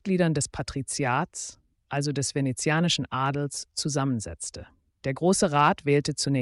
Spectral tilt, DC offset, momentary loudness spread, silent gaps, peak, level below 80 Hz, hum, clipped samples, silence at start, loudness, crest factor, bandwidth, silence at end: -4.5 dB/octave; under 0.1%; 13 LU; none; -10 dBFS; -54 dBFS; none; under 0.1%; 0.05 s; -26 LUFS; 18 dB; 11.5 kHz; 0 s